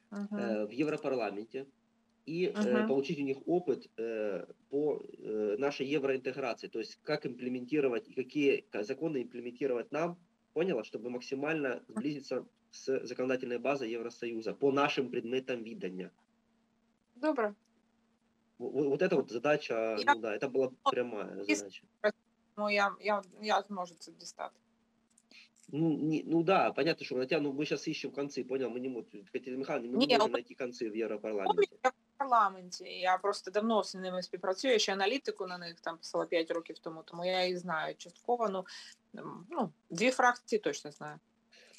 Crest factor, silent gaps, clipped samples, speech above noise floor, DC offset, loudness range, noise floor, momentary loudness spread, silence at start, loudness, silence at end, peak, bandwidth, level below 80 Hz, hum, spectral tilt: 22 dB; none; under 0.1%; 41 dB; under 0.1%; 4 LU; -74 dBFS; 13 LU; 0.1 s; -34 LUFS; 0.6 s; -12 dBFS; 12 kHz; -88 dBFS; none; -4.5 dB/octave